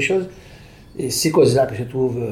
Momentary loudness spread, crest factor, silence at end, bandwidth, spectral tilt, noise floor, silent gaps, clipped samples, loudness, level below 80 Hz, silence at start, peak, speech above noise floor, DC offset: 16 LU; 16 dB; 0 s; 16.5 kHz; -5 dB/octave; -42 dBFS; none; under 0.1%; -19 LUFS; -48 dBFS; 0 s; -2 dBFS; 24 dB; under 0.1%